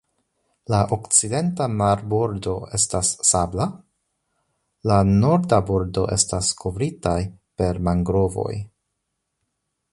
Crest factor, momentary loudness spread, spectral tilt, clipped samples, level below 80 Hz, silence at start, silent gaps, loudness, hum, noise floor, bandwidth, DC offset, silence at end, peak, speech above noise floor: 20 dB; 10 LU; -5 dB/octave; under 0.1%; -40 dBFS; 0.7 s; none; -21 LUFS; none; -77 dBFS; 11.5 kHz; under 0.1%; 1.25 s; -2 dBFS; 57 dB